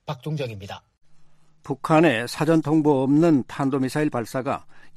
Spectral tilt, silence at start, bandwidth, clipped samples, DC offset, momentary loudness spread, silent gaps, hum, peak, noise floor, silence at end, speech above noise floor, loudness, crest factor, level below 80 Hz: -7 dB/octave; 0.05 s; 14 kHz; under 0.1%; under 0.1%; 14 LU; none; none; -6 dBFS; -48 dBFS; 0 s; 27 dB; -22 LUFS; 18 dB; -58 dBFS